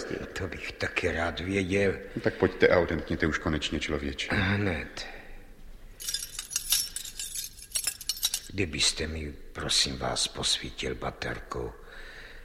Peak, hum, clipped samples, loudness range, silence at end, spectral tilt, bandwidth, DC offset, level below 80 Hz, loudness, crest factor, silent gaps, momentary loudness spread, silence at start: -6 dBFS; none; under 0.1%; 4 LU; 0 s; -3 dB/octave; 16.5 kHz; under 0.1%; -44 dBFS; -29 LUFS; 24 dB; none; 13 LU; 0 s